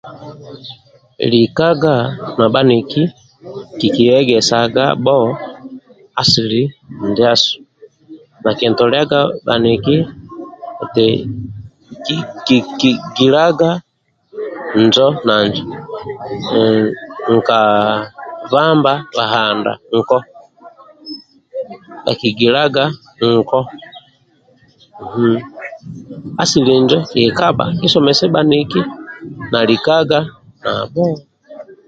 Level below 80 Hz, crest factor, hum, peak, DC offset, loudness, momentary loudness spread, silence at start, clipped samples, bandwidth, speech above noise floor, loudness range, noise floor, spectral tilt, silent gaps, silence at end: -50 dBFS; 14 dB; none; 0 dBFS; under 0.1%; -14 LUFS; 19 LU; 0.05 s; under 0.1%; 9 kHz; 39 dB; 4 LU; -53 dBFS; -5.5 dB/octave; none; 0.15 s